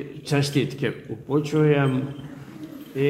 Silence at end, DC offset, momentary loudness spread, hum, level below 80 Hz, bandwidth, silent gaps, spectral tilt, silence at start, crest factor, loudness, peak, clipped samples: 0 s; under 0.1%; 19 LU; none; -60 dBFS; 15 kHz; none; -6.5 dB/octave; 0 s; 18 dB; -24 LUFS; -6 dBFS; under 0.1%